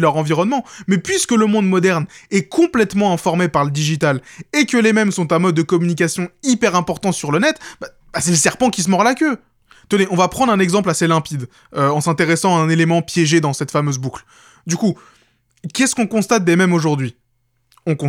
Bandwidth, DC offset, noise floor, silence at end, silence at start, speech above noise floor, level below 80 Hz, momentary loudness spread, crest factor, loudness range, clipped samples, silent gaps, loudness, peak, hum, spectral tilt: 16 kHz; under 0.1%; -64 dBFS; 0 s; 0 s; 48 dB; -54 dBFS; 10 LU; 16 dB; 2 LU; under 0.1%; none; -16 LUFS; 0 dBFS; none; -5 dB/octave